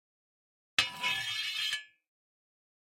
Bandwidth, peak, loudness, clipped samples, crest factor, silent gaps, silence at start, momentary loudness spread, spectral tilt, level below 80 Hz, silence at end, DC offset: 16.5 kHz; -8 dBFS; -32 LUFS; under 0.1%; 30 dB; none; 0.8 s; 4 LU; 0.5 dB/octave; -76 dBFS; 1.15 s; under 0.1%